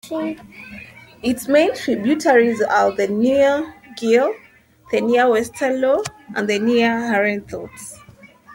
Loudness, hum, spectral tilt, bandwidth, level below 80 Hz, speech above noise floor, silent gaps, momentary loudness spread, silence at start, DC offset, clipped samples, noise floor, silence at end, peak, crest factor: -18 LUFS; none; -4.5 dB/octave; 16.5 kHz; -56 dBFS; 28 dB; none; 19 LU; 0.05 s; under 0.1%; under 0.1%; -46 dBFS; 0 s; -2 dBFS; 16 dB